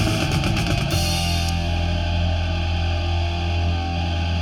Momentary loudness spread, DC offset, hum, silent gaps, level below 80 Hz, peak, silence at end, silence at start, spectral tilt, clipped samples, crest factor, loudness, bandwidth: 3 LU; under 0.1%; none; none; -28 dBFS; -8 dBFS; 0 s; 0 s; -5 dB/octave; under 0.1%; 12 dB; -22 LUFS; 15 kHz